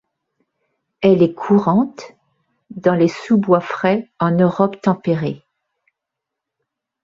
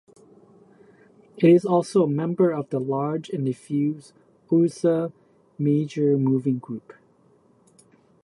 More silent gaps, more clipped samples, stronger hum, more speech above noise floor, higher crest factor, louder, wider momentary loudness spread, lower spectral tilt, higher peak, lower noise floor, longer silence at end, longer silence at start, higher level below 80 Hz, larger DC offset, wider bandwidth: neither; neither; neither; first, 66 dB vs 37 dB; about the same, 16 dB vs 18 dB; first, -17 LUFS vs -23 LUFS; about the same, 10 LU vs 10 LU; about the same, -8.5 dB/octave vs -8.5 dB/octave; first, -2 dBFS vs -6 dBFS; first, -82 dBFS vs -59 dBFS; first, 1.65 s vs 1.45 s; second, 1 s vs 1.35 s; first, -60 dBFS vs -72 dBFS; neither; second, 7.4 kHz vs 11.5 kHz